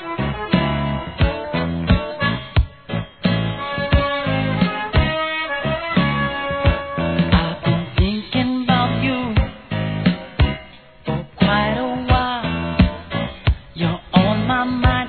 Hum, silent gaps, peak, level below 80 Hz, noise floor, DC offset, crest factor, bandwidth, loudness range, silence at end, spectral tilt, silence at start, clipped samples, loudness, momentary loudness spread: none; none; 0 dBFS; -28 dBFS; -41 dBFS; 0.2%; 20 dB; 4.6 kHz; 2 LU; 0 s; -10 dB/octave; 0 s; under 0.1%; -20 LUFS; 7 LU